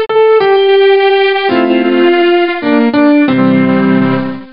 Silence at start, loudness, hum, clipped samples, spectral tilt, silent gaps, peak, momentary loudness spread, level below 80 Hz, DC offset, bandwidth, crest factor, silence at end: 0 s; -9 LUFS; none; under 0.1%; -11 dB/octave; none; 0 dBFS; 4 LU; -54 dBFS; 0.9%; 5.4 kHz; 8 dB; 0.05 s